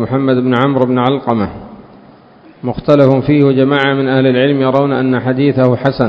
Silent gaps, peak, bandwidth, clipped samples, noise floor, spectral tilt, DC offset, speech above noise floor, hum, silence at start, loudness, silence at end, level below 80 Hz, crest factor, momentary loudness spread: none; 0 dBFS; 5.8 kHz; 0.2%; -41 dBFS; -9 dB/octave; under 0.1%; 30 dB; none; 0 s; -12 LUFS; 0 s; -44 dBFS; 12 dB; 8 LU